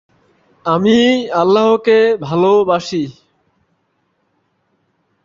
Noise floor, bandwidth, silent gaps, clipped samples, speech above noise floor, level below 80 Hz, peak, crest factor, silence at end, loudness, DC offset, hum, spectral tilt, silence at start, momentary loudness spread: -64 dBFS; 7.6 kHz; none; under 0.1%; 52 dB; -56 dBFS; -2 dBFS; 14 dB; 2.15 s; -13 LUFS; under 0.1%; none; -6 dB/octave; 0.65 s; 10 LU